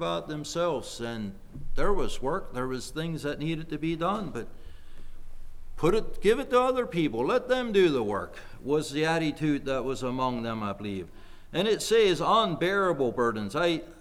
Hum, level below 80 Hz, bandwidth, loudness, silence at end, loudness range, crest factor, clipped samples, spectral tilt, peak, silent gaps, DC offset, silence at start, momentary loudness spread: none; -40 dBFS; 14 kHz; -28 LUFS; 0 s; 6 LU; 16 dB; under 0.1%; -5 dB/octave; -10 dBFS; none; under 0.1%; 0 s; 12 LU